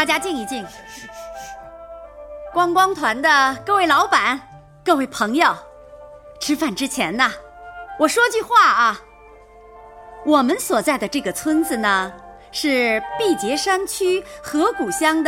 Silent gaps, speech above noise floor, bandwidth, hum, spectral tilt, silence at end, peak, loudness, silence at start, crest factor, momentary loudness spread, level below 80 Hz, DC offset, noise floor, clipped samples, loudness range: none; 27 dB; 17.5 kHz; none; -2.5 dB/octave; 0 s; -2 dBFS; -18 LUFS; 0 s; 18 dB; 20 LU; -52 dBFS; under 0.1%; -45 dBFS; under 0.1%; 3 LU